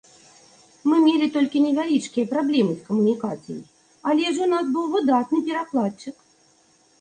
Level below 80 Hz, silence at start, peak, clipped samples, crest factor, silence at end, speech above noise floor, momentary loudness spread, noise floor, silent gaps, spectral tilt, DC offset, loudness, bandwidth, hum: -70 dBFS; 0.85 s; -8 dBFS; under 0.1%; 14 dB; 0.9 s; 38 dB; 12 LU; -59 dBFS; none; -5.5 dB/octave; under 0.1%; -22 LUFS; 9.6 kHz; none